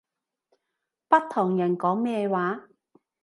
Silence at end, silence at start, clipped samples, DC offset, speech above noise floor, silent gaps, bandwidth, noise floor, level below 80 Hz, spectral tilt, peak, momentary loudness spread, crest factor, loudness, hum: 0.6 s; 1.1 s; under 0.1%; under 0.1%; 59 dB; none; 11.5 kHz; -83 dBFS; -80 dBFS; -8 dB/octave; -6 dBFS; 6 LU; 20 dB; -25 LUFS; none